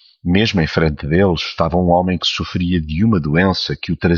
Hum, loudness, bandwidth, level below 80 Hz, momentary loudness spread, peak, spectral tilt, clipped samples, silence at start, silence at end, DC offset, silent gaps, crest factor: none; -16 LUFS; 7.2 kHz; -34 dBFS; 4 LU; -2 dBFS; -6.5 dB/octave; under 0.1%; 0.25 s; 0 s; under 0.1%; none; 14 dB